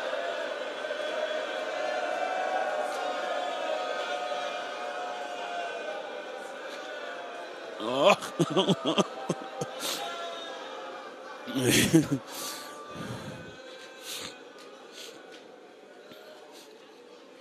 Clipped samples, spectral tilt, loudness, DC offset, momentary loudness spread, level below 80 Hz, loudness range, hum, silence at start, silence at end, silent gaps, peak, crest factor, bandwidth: under 0.1%; -4 dB/octave; -31 LUFS; under 0.1%; 23 LU; -66 dBFS; 13 LU; none; 0 s; 0 s; none; -6 dBFS; 26 dB; 15 kHz